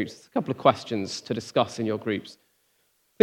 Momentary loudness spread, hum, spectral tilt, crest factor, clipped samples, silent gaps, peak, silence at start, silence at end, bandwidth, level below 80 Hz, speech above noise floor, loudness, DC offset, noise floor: 9 LU; none; -5.5 dB/octave; 24 dB; under 0.1%; none; -2 dBFS; 0 s; 0.9 s; 16.5 kHz; -74 dBFS; 42 dB; -27 LUFS; under 0.1%; -69 dBFS